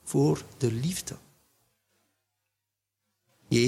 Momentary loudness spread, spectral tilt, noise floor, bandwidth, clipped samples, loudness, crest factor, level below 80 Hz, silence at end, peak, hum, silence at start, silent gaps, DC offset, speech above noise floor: 14 LU; -5.5 dB/octave; -85 dBFS; 15.5 kHz; under 0.1%; -29 LUFS; 20 dB; -60 dBFS; 0 s; -10 dBFS; none; 0.05 s; none; under 0.1%; 57 dB